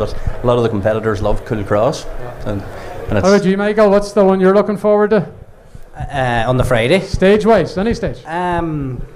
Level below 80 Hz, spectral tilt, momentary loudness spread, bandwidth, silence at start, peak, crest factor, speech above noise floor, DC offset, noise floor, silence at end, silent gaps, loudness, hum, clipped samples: -28 dBFS; -6.5 dB/octave; 13 LU; 14.5 kHz; 0 s; -2 dBFS; 12 dB; 21 dB; under 0.1%; -35 dBFS; 0 s; none; -15 LUFS; none; under 0.1%